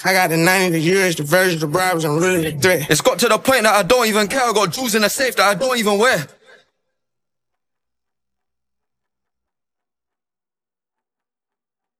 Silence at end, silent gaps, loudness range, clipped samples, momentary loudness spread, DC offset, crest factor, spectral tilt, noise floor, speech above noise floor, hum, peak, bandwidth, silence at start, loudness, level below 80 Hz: 5.75 s; none; 7 LU; under 0.1%; 4 LU; under 0.1%; 18 dB; -3.5 dB/octave; under -90 dBFS; over 74 dB; none; 0 dBFS; 16 kHz; 0 s; -16 LUFS; -54 dBFS